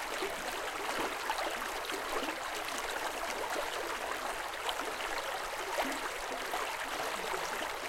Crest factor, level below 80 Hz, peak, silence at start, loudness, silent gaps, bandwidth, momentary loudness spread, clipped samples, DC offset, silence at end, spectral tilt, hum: 18 dB; -58 dBFS; -18 dBFS; 0 s; -36 LUFS; none; 17 kHz; 2 LU; under 0.1%; under 0.1%; 0 s; -1 dB/octave; none